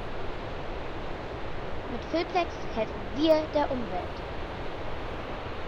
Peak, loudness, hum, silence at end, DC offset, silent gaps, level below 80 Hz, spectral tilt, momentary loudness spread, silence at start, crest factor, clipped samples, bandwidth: -12 dBFS; -32 LUFS; none; 0 s; under 0.1%; none; -42 dBFS; -6.5 dB/octave; 12 LU; 0 s; 20 dB; under 0.1%; 7.6 kHz